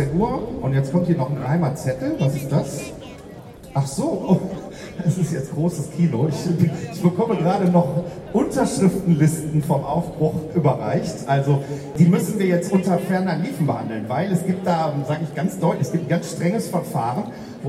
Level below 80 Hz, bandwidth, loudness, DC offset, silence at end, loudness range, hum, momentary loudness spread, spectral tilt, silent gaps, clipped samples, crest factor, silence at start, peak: -48 dBFS; 14.5 kHz; -21 LUFS; under 0.1%; 0 s; 4 LU; none; 7 LU; -7.5 dB/octave; none; under 0.1%; 18 dB; 0 s; -4 dBFS